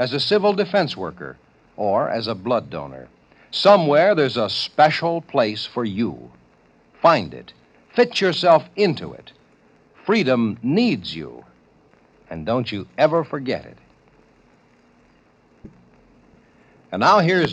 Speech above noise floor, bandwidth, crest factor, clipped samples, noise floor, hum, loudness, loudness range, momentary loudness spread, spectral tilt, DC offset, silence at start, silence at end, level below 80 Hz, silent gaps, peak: 37 dB; 9.4 kHz; 20 dB; under 0.1%; -56 dBFS; none; -19 LUFS; 7 LU; 17 LU; -6 dB/octave; under 0.1%; 0 s; 0 s; -60 dBFS; none; -2 dBFS